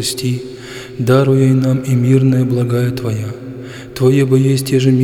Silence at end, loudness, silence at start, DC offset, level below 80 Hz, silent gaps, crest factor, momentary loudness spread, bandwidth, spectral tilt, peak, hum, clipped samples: 0 s; -14 LUFS; 0 s; under 0.1%; -48 dBFS; none; 12 dB; 17 LU; 15.5 kHz; -7 dB/octave; 0 dBFS; none; under 0.1%